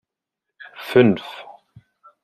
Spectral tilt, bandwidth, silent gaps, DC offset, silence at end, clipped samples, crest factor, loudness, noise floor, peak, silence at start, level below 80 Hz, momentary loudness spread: -7.5 dB/octave; 14 kHz; none; under 0.1%; 0.8 s; under 0.1%; 20 dB; -18 LUFS; -83 dBFS; -2 dBFS; 0.8 s; -64 dBFS; 23 LU